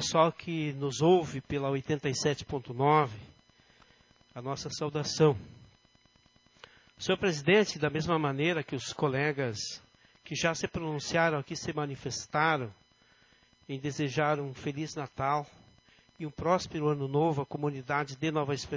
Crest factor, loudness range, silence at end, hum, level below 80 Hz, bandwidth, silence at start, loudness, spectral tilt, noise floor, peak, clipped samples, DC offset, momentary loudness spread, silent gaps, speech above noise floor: 20 dB; 5 LU; 0 s; none; -60 dBFS; 7.6 kHz; 0 s; -31 LUFS; -5 dB/octave; -65 dBFS; -10 dBFS; under 0.1%; under 0.1%; 12 LU; none; 35 dB